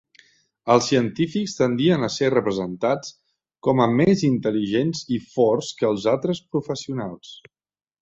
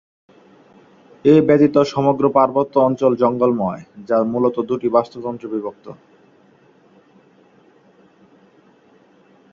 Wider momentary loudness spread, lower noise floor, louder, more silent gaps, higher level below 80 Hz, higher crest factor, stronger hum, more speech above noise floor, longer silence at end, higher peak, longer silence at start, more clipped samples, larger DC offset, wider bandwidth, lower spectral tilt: about the same, 11 LU vs 13 LU; first, -57 dBFS vs -52 dBFS; second, -22 LUFS vs -17 LUFS; neither; about the same, -58 dBFS vs -60 dBFS; about the same, 20 dB vs 18 dB; neither; about the same, 36 dB vs 36 dB; second, 0.65 s vs 3.6 s; about the same, -4 dBFS vs -2 dBFS; second, 0.65 s vs 1.25 s; neither; neither; about the same, 8 kHz vs 7.4 kHz; second, -6 dB/octave vs -8 dB/octave